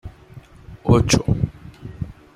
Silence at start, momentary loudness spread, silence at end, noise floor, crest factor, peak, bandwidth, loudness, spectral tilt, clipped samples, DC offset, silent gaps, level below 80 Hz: 0.05 s; 23 LU; 0.25 s; -43 dBFS; 20 dB; -2 dBFS; 15.5 kHz; -19 LUFS; -5.5 dB/octave; under 0.1%; under 0.1%; none; -36 dBFS